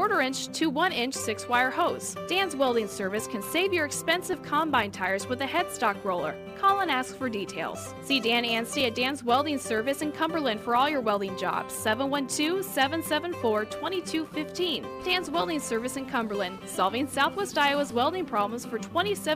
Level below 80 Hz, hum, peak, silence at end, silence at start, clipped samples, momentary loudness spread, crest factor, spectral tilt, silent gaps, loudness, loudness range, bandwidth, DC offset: -62 dBFS; none; -10 dBFS; 0 s; 0 s; under 0.1%; 7 LU; 18 dB; -3 dB/octave; none; -27 LUFS; 2 LU; 15.5 kHz; under 0.1%